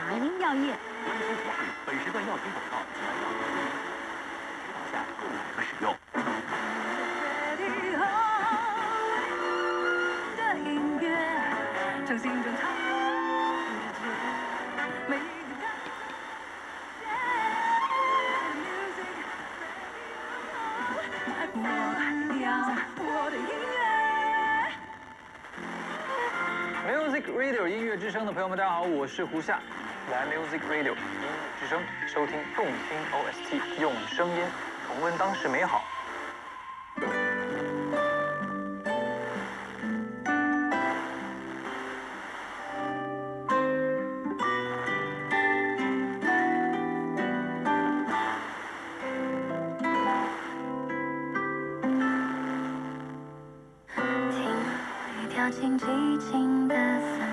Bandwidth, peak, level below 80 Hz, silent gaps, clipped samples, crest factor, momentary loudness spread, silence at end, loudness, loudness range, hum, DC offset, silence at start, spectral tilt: 12 kHz; -14 dBFS; -68 dBFS; none; under 0.1%; 16 dB; 10 LU; 0 s; -30 LUFS; 4 LU; none; under 0.1%; 0 s; -4.5 dB/octave